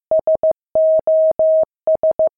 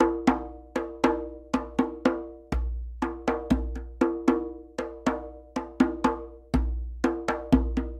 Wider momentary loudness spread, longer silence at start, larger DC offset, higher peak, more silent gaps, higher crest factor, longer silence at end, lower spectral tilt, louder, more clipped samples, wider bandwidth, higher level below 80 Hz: second, 4 LU vs 12 LU; about the same, 0.1 s vs 0 s; neither; second, -10 dBFS vs -6 dBFS; neither; second, 6 dB vs 22 dB; about the same, 0.1 s vs 0 s; first, -12 dB/octave vs -7 dB/octave; first, -16 LUFS vs -29 LUFS; neither; second, 1.6 kHz vs 11 kHz; second, -54 dBFS vs -36 dBFS